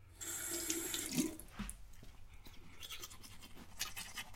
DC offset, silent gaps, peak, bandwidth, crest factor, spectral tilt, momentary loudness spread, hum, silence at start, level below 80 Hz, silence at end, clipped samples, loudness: under 0.1%; none; -20 dBFS; 16.5 kHz; 26 dB; -2 dB/octave; 21 LU; none; 0 s; -58 dBFS; 0 s; under 0.1%; -42 LUFS